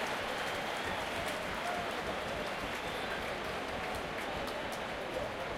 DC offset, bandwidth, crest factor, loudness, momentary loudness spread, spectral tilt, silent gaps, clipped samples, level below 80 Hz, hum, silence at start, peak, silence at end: under 0.1%; 16.5 kHz; 14 dB; -37 LUFS; 2 LU; -3.5 dB/octave; none; under 0.1%; -56 dBFS; none; 0 s; -22 dBFS; 0 s